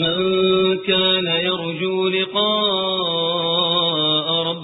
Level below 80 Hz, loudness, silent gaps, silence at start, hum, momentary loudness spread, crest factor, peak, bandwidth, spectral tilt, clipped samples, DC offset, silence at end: -56 dBFS; -18 LUFS; none; 0 s; none; 3 LU; 16 dB; -4 dBFS; 4.1 kHz; -10 dB/octave; under 0.1%; under 0.1%; 0 s